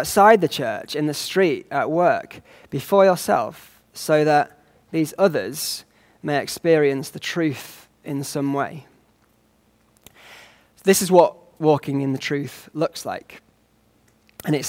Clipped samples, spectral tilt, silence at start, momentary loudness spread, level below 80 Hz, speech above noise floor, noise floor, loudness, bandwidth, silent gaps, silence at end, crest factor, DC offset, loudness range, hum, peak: under 0.1%; -4.5 dB/octave; 0 s; 16 LU; -62 dBFS; 40 dB; -61 dBFS; -21 LUFS; 16.5 kHz; none; 0 s; 20 dB; under 0.1%; 6 LU; none; -2 dBFS